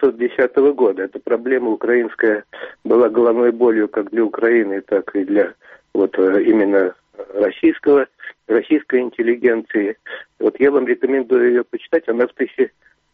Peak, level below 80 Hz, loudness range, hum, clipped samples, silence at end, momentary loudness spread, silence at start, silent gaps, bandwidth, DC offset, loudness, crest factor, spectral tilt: -4 dBFS; -62 dBFS; 1 LU; none; under 0.1%; 0.45 s; 9 LU; 0 s; none; 3.9 kHz; under 0.1%; -17 LUFS; 14 dB; -4.5 dB/octave